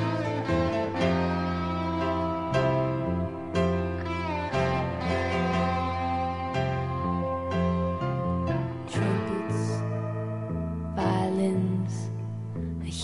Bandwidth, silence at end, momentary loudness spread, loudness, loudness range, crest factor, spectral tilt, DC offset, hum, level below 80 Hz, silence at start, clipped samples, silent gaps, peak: 11.5 kHz; 0 s; 6 LU; -28 LUFS; 2 LU; 16 dB; -7 dB/octave; under 0.1%; none; -46 dBFS; 0 s; under 0.1%; none; -12 dBFS